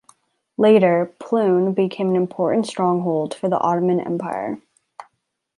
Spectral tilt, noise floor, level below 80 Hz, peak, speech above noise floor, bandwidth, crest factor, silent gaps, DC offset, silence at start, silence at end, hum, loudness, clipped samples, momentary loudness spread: -7.5 dB/octave; -73 dBFS; -68 dBFS; -2 dBFS; 55 dB; 11.5 kHz; 18 dB; none; under 0.1%; 0.6 s; 0.55 s; none; -19 LUFS; under 0.1%; 11 LU